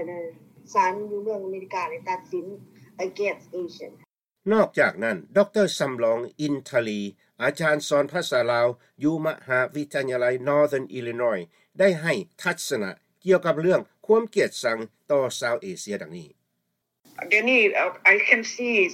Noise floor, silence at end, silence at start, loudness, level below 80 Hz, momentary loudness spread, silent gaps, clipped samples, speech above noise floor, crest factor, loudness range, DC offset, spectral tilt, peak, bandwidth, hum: -78 dBFS; 0 s; 0 s; -24 LUFS; -74 dBFS; 14 LU; none; under 0.1%; 54 dB; 22 dB; 6 LU; under 0.1%; -4.5 dB/octave; -2 dBFS; 16 kHz; none